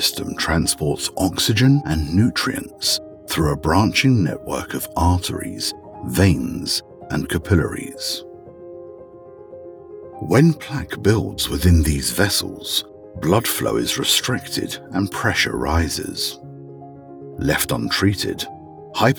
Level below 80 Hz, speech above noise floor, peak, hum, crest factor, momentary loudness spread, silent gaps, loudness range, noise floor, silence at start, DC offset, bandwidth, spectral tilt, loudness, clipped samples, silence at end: -34 dBFS; 21 dB; 0 dBFS; none; 20 dB; 22 LU; none; 5 LU; -41 dBFS; 0 s; under 0.1%; over 20 kHz; -4.5 dB/octave; -20 LUFS; under 0.1%; 0 s